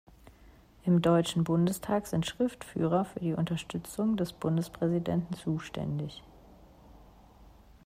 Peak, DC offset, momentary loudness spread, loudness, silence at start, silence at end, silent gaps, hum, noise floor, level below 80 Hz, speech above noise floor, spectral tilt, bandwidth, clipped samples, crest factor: -14 dBFS; under 0.1%; 9 LU; -31 LUFS; 0.25 s; 0.9 s; none; none; -57 dBFS; -58 dBFS; 27 dB; -6.5 dB/octave; 16 kHz; under 0.1%; 18 dB